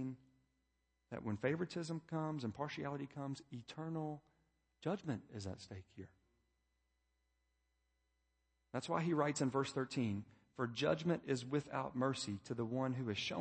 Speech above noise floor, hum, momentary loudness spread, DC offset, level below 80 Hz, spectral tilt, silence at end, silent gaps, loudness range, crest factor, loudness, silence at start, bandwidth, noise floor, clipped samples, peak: 42 dB; 60 Hz at -75 dBFS; 14 LU; under 0.1%; -76 dBFS; -5.5 dB/octave; 0 s; none; 11 LU; 22 dB; -42 LUFS; 0 s; 8.4 kHz; -83 dBFS; under 0.1%; -22 dBFS